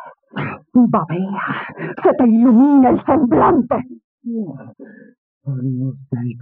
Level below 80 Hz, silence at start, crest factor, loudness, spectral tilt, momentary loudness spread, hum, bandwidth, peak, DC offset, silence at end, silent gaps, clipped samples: -52 dBFS; 0 s; 16 dB; -16 LUFS; -11 dB/octave; 18 LU; none; 3.6 kHz; -2 dBFS; under 0.1%; 0 s; 4.04-4.18 s, 5.18-5.41 s; under 0.1%